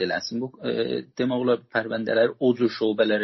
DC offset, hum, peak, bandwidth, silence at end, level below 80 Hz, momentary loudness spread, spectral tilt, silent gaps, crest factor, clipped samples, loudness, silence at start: under 0.1%; none; -8 dBFS; 6.2 kHz; 0 s; -66 dBFS; 7 LU; -4 dB/octave; none; 16 dB; under 0.1%; -25 LUFS; 0 s